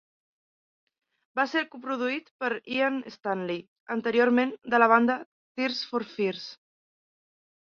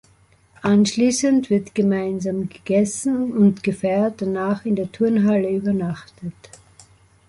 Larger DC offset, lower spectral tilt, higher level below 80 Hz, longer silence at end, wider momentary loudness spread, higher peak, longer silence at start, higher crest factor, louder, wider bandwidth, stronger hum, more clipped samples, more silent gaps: neither; about the same, -5.5 dB/octave vs -6 dB/octave; second, -76 dBFS vs -56 dBFS; about the same, 1.1 s vs 1 s; about the same, 12 LU vs 10 LU; about the same, -6 dBFS vs -6 dBFS; first, 1.35 s vs 0.65 s; first, 24 dB vs 16 dB; second, -27 LUFS vs -20 LUFS; second, 7 kHz vs 11.5 kHz; neither; neither; first, 2.31-2.39 s, 3.68-3.86 s, 5.26-5.55 s vs none